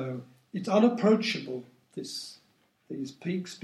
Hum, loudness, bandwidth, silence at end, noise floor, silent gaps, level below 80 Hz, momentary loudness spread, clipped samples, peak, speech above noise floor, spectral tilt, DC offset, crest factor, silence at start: none; -29 LUFS; 12.5 kHz; 0.05 s; -68 dBFS; none; -82 dBFS; 18 LU; under 0.1%; -10 dBFS; 40 dB; -5.5 dB/octave; under 0.1%; 20 dB; 0 s